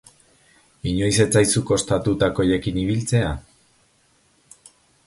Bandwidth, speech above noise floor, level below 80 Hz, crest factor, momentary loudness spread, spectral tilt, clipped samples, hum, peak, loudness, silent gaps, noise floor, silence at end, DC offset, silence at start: 11.5 kHz; 41 dB; -42 dBFS; 20 dB; 10 LU; -5 dB/octave; under 0.1%; none; -2 dBFS; -20 LUFS; none; -61 dBFS; 1.65 s; under 0.1%; 0.85 s